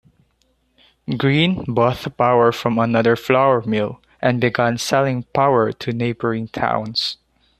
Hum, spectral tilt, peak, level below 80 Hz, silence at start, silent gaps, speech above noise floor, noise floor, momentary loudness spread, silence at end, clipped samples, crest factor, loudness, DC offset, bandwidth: none; -6 dB/octave; -2 dBFS; -52 dBFS; 1.1 s; none; 46 dB; -63 dBFS; 7 LU; 0.45 s; under 0.1%; 16 dB; -18 LUFS; under 0.1%; 14 kHz